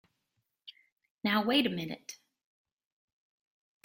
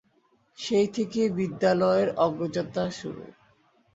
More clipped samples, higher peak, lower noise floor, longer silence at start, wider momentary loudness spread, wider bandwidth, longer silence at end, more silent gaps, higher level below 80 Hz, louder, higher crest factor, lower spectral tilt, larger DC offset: neither; about the same, -10 dBFS vs -10 dBFS; first, -82 dBFS vs -66 dBFS; about the same, 0.65 s vs 0.6 s; first, 17 LU vs 14 LU; first, 16.5 kHz vs 8 kHz; first, 1.7 s vs 0.65 s; first, 0.92-0.96 s, 1.11-1.17 s vs none; second, -76 dBFS vs -64 dBFS; second, -30 LUFS vs -26 LUFS; first, 26 dB vs 18 dB; second, -4.5 dB/octave vs -6 dB/octave; neither